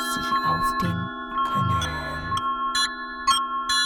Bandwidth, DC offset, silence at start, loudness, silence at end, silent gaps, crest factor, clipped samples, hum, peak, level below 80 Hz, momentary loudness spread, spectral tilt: 18.5 kHz; under 0.1%; 0 s; -24 LUFS; 0 s; none; 18 dB; under 0.1%; none; -8 dBFS; -44 dBFS; 6 LU; -3 dB/octave